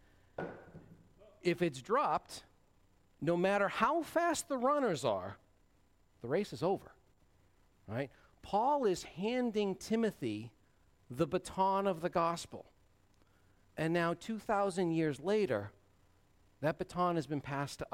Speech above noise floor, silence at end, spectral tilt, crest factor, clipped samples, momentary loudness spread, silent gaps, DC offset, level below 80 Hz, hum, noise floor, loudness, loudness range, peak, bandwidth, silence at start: 36 dB; 0.05 s; -5.5 dB/octave; 20 dB; under 0.1%; 14 LU; none; under 0.1%; -68 dBFS; none; -71 dBFS; -35 LUFS; 4 LU; -16 dBFS; 16.5 kHz; 0.4 s